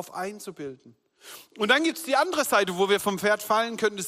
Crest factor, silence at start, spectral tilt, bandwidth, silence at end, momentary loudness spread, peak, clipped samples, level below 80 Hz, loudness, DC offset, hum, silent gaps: 18 dB; 0 s; -3 dB/octave; 16 kHz; 0 s; 18 LU; -8 dBFS; under 0.1%; -72 dBFS; -24 LUFS; under 0.1%; none; none